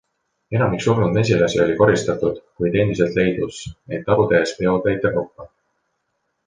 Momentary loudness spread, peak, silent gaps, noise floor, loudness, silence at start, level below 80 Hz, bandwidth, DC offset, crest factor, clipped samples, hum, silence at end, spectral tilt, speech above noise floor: 10 LU; -2 dBFS; none; -73 dBFS; -19 LUFS; 0.5 s; -46 dBFS; 9.8 kHz; under 0.1%; 18 dB; under 0.1%; none; 1 s; -6.5 dB/octave; 54 dB